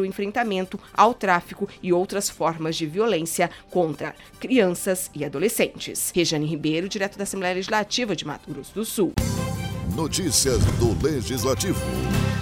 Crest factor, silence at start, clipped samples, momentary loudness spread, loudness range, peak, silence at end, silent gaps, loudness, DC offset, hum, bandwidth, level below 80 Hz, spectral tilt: 20 dB; 0 s; under 0.1%; 9 LU; 2 LU; -2 dBFS; 0 s; none; -24 LUFS; under 0.1%; none; 18 kHz; -40 dBFS; -4.5 dB/octave